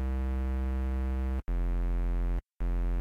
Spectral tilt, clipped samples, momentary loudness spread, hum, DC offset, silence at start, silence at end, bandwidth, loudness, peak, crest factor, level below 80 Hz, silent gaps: -9 dB/octave; under 0.1%; 3 LU; none; under 0.1%; 0 s; 0 s; 3.8 kHz; -34 LUFS; -26 dBFS; 4 dB; -30 dBFS; none